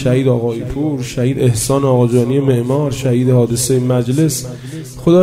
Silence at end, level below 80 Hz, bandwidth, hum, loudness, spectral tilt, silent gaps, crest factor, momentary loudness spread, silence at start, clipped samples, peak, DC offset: 0 s; -40 dBFS; 16 kHz; none; -15 LUFS; -6.5 dB/octave; none; 14 dB; 7 LU; 0 s; under 0.1%; 0 dBFS; under 0.1%